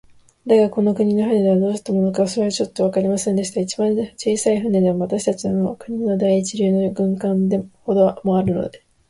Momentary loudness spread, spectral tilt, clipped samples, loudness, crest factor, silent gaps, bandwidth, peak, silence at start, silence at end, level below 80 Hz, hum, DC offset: 6 LU; -6.5 dB/octave; under 0.1%; -19 LUFS; 14 dB; none; 11.5 kHz; -4 dBFS; 0.45 s; 0.3 s; -54 dBFS; none; under 0.1%